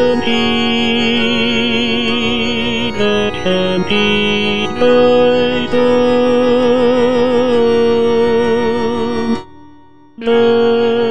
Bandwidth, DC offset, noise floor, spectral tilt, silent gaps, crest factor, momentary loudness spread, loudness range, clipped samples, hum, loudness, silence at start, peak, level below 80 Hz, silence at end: 9.4 kHz; 5%; -43 dBFS; -5.5 dB/octave; none; 12 dB; 5 LU; 3 LU; under 0.1%; none; -13 LUFS; 0 s; -2 dBFS; -40 dBFS; 0 s